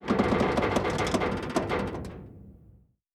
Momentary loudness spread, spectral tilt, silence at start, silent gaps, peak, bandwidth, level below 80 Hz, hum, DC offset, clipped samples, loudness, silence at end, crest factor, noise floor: 16 LU; -5.5 dB/octave; 0 s; none; -12 dBFS; 14 kHz; -44 dBFS; none; under 0.1%; under 0.1%; -28 LUFS; 0.6 s; 18 dB; -58 dBFS